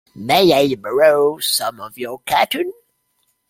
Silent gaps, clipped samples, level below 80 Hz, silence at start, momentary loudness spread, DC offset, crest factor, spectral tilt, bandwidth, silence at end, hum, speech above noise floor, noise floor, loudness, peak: none; under 0.1%; -58 dBFS; 0.15 s; 14 LU; under 0.1%; 18 dB; -3.5 dB/octave; 16.5 kHz; 0.8 s; none; 50 dB; -67 dBFS; -16 LUFS; 0 dBFS